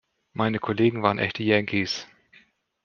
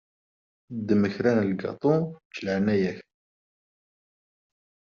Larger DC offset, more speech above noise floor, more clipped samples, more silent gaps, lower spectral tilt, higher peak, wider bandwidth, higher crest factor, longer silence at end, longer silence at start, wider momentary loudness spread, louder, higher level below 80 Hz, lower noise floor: neither; second, 35 dB vs over 65 dB; neither; second, none vs 2.25-2.30 s; about the same, -6 dB/octave vs -7 dB/octave; first, -4 dBFS vs -8 dBFS; about the same, 7.2 kHz vs 7 kHz; about the same, 22 dB vs 20 dB; second, 0.8 s vs 2 s; second, 0.35 s vs 0.7 s; second, 8 LU vs 12 LU; about the same, -24 LUFS vs -26 LUFS; about the same, -64 dBFS vs -66 dBFS; second, -59 dBFS vs under -90 dBFS